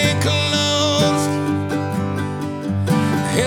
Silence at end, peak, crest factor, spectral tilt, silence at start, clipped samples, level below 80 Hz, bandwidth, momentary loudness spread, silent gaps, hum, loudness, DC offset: 0 s; -2 dBFS; 16 dB; -4.5 dB/octave; 0 s; under 0.1%; -50 dBFS; 17.5 kHz; 7 LU; none; 50 Hz at -40 dBFS; -19 LUFS; under 0.1%